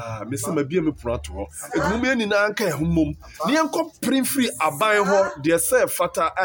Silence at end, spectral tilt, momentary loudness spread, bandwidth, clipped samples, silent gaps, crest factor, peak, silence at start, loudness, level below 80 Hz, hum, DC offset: 0 s; -4.5 dB/octave; 9 LU; 17 kHz; under 0.1%; none; 16 dB; -6 dBFS; 0 s; -21 LUFS; -42 dBFS; none; under 0.1%